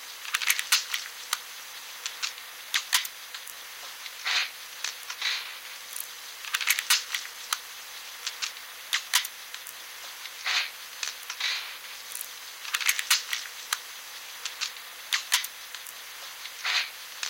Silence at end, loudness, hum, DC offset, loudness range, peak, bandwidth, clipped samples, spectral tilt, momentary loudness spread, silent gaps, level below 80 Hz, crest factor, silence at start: 0 s; -30 LUFS; none; under 0.1%; 4 LU; -2 dBFS; 17 kHz; under 0.1%; 5 dB/octave; 14 LU; none; -78 dBFS; 30 dB; 0 s